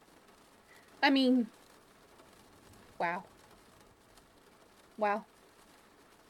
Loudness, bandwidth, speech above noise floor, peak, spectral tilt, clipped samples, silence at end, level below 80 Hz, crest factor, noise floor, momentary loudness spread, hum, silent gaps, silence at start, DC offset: -32 LUFS; 13.5 kHz; 32 dB; -14 dBFS; -4.5 dB/octave; under 0.1%; 1.05 s; -74 dBFS; 24 dB; -62 dBFS; 17 LU; none; none; 1 s; under 0.1%